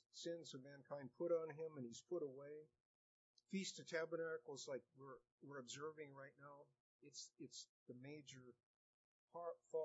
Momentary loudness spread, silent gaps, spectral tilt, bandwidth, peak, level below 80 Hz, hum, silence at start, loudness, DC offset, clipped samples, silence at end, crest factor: 16 LU; 2.80-3.34 s, 5.32-5.38 s, 6.80-6.99 s, 7.69-7.86 s, 8.63-9.28 s; -4 dB/octave; 7.6 kHz; -32 dBFS; under -90 dBFS; none; 0.15 s; -52 LUFS; under 0.1%; under 0.1%; 0 s; 20 dB